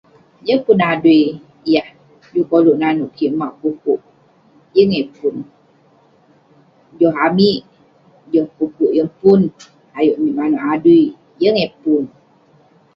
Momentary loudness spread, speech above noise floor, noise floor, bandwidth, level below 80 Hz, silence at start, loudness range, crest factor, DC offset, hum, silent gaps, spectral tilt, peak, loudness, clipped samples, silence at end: 10 LU; 38 dB; -52 dBFS; 6.2 kHz; -58 dBFS; 0.45 s; 5 LU; 16 dB; under 0.1%; none; none; -8 dB/octave; 0 dBFS; -16 LUFS; under 0.1%; 0.9 s